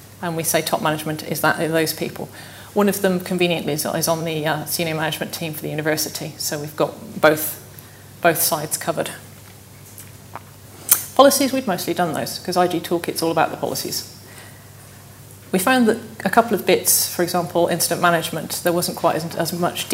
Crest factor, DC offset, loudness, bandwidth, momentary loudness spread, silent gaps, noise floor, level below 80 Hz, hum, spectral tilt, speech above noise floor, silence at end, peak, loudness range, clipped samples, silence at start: 22 dB; under 0.1%; -20 LUFS; 16.5 kHz; 18 LU; none; -42 dBFS; -60 dBFS; none; -3.5 dB/octave; 22 dB; 0 s; 0 dBFS; 5 LU; under 0.1%; 0 s